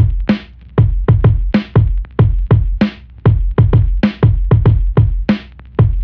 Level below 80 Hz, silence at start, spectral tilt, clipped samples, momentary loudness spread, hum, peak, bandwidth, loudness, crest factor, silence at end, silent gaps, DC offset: -18 dBFS; 0 s; -10.5 dB/octave; under 0.1%; 6 LU; none; 0 dBFS; 5.2 kHz; -14 LUFS; 12 dB; 0 s; none; 0.5%